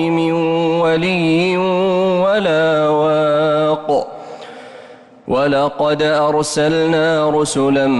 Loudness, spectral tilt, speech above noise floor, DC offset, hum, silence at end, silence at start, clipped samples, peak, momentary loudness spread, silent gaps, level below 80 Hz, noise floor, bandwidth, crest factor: -15 LUFS; -5.5 dB/octave; 25 dB; under 0.1%; none; 0 s; 0 s; under 0.1%; -6 dBFS; 6 LU; none; -52 dBFS; -39 dBFS; 11.5 kHz; 8 dB